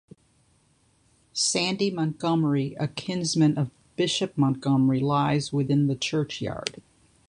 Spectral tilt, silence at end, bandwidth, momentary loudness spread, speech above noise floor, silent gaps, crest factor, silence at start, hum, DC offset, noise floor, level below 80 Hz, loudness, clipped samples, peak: -5 dB/octave; 0.5 s; 11 kHz; 8 LU; 40 dB; none; 18 dB; 1.35 s; none; under 0.1%; -64 dBFS; -60 dBFS; -25 LUFS; under 0.1%; -8 dBFS